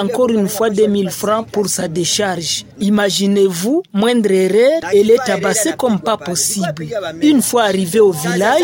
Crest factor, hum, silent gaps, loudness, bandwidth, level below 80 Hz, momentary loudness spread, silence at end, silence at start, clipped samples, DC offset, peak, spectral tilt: 14 dB; none; none; -15 LUFS; 17 kHz; -54 dBFS; 6 LU; 0 s; 0 s; under 0.1%; under 0.1%; 0 dBFS; -4 dB/octave